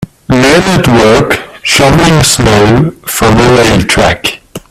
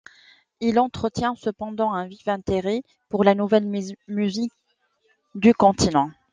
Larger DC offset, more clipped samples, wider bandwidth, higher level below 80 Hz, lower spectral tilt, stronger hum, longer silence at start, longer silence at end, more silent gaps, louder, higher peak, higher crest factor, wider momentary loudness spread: neither; first, 0.4% vs under 0.1%; first, 16.5 kHz vs 9.8 kHz; first, -26 dBFS vs -52 dBFS; about the same, -4.5 dB/octave vs -5.5 dB/octave; neither; second, 0 s vs 0.6 s; about the same, 0.1 s vs 0.2 s; neither; first, -7 LUFS vs -22 LUFS; first, 0 dBFS vs -4 dBFS; second, 8 dB vs 20 dB; second, 7 LU vs 12 LU